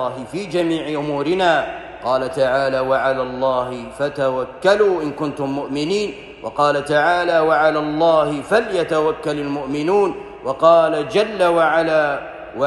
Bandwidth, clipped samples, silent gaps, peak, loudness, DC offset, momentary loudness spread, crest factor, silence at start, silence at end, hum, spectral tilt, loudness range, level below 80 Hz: 12 kHz; under 0.1%; none; -2 dBFS; -18 LUFS; under 0.1%; 9 LU; 16 dB; 0 s; 0 s; none; -5.5 dB/octave; 3 LU; -50 dBFS